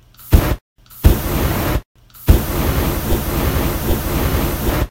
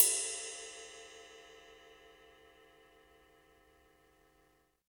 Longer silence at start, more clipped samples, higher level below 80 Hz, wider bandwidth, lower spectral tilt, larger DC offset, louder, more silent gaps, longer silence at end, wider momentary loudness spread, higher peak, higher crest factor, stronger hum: first, 0.2 s vs 0 s; first, 0.2% vs under 0.1%; first, -20 dBFS vs -76 dBFS; second, 17 kHz vs 19.5 kHz; first, -5.5 dB/octave vs 1.5 dB/octave; neither; first, -18 LUFS vs -36 LUFS; first, 0.61-0.76 s, 1.85-1.95 s vs none; second, 0 s vs 3.15 s; second, 5 LU vs 25 LU; first, 0 dBFS vs -4 dBFS; second, 16 dB vs 36 dB; neither